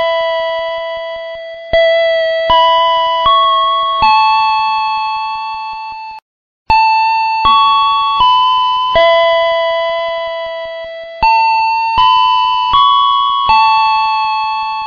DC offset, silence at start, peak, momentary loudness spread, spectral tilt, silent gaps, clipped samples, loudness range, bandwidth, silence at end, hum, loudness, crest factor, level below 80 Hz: under 0.1%; 0 s; 0 dBFS; 13 LU; 2 dB/octave; 6.22-6.66 s; under 0.1%; 3 LU; 7 kHz; 0 s; none; -11 LUFS; 12 dB; -38 dBFS